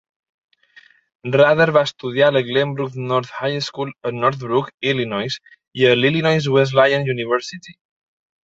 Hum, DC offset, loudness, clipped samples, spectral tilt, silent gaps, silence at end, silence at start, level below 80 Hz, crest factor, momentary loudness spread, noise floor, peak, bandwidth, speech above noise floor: none; under 0.1%; -18 LUFS; under 0.1%; -6 dB/octave; 4.74-4.78 s, 5.67-5.71 s; 0.7 s; 1.25 s; -60 dBFS; 18 dB; 11 LU; -51 dBFS; 0 dBFS; 7.8 kHz; 33 dB